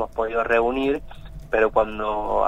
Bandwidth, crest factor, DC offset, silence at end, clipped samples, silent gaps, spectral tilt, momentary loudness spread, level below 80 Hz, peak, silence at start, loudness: 9.6 kHz; 16 dB; under 0.1%; 0 s; under 0.1%; none; -6.5 dB/octave; 9 LU; -40 dBFS; -6 dBFS; 0 s; -22 LUFS